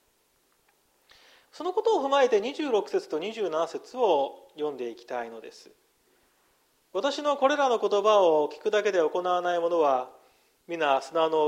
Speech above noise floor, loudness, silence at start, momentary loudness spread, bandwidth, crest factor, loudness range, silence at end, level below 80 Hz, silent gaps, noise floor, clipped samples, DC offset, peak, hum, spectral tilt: 43 dB; -26 LUFS; 1.55 s; 13 LU; 12.5 kHz; 18 dB; 8 LU; 0 s; -80 dBFS; none; -69 dBFS; under 0.1%; under 0.1%; -10 dBFS; none; -3.5 dB/octave